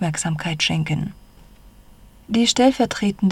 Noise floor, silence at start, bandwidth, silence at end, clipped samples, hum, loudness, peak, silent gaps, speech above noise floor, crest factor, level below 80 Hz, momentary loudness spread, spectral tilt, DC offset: -47 dBFS; 0 s; 14 kHz; 0 s; under 0.1%; none; -20 LUFS; -4 dBFS; none; 27 dB; 18 dB; -48 dBFS; 9 LU; -4.5 dB/octave; under 0.1%